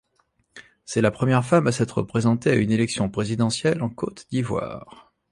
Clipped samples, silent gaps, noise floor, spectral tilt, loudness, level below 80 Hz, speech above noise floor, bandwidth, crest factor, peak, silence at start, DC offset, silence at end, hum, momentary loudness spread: under 0.1%; none; -68 dBFS; -6 dB/octave; -23 LUFS; -54 dBFS; 46 dB; 11.5 kHz; 18 dB; -4 dBFS; 0.55 s; under 0.1%; 0.45 s; none; 9 LU